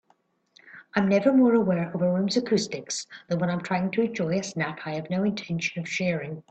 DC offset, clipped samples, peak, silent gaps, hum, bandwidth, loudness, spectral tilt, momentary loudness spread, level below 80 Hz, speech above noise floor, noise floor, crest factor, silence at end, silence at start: under 0.1%; under 0.1%; -8 dBFS; none; none; 8.8 kHz; -26 LUFS; -5.5 dB/octave; 10 LU; -66 dBFS; 42 dB; -67 dBFS; 18 dB; 0.1 s; 0.65 s